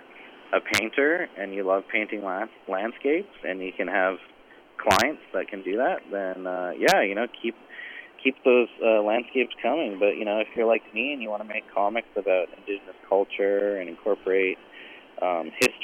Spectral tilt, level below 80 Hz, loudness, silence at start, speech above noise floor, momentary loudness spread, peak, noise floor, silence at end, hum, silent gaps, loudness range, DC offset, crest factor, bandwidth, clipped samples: -3.5 dB/octave; -64 dBFS; -26 LUFS; 0 s; 22 dB; 12 LU; -8 dBFS; -47 dBFS; 0 s; none; none; 3 LU; under 0.1%; 18 dB; 16.5 kHz; under 0.1%